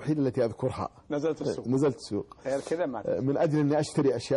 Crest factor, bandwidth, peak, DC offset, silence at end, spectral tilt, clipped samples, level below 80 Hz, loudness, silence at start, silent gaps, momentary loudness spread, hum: 14 dB; 11.5 kHz; -14 dBFS; under 0.1%; 0 s; -7 dB/octave; under 0.1%; -60 dBFS; -29 LUFS; 0 s; none; 8 LU; none